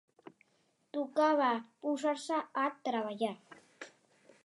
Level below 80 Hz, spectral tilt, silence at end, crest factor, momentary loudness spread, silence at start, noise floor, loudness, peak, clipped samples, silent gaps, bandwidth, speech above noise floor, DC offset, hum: under -90 dBFS; -4 dB/octave; 0.55 s; 18 dB; 22 LU; 0.25 s; -75 dBFS; -34 LUFS; -16 dBFS; under 0.1%; none; 11.5 kHz; 41 dB; under 0.1%; none